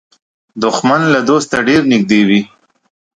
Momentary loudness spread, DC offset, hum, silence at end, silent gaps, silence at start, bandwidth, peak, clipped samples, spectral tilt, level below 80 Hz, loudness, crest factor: 7 LU; under 0.1%; none; 0.7 s; none; 0.55 s; 10.5 kHz; 0 dBFS; under 0.1%; -5 dB/octave; -50 dBFS; -12 LUFS; 14 dB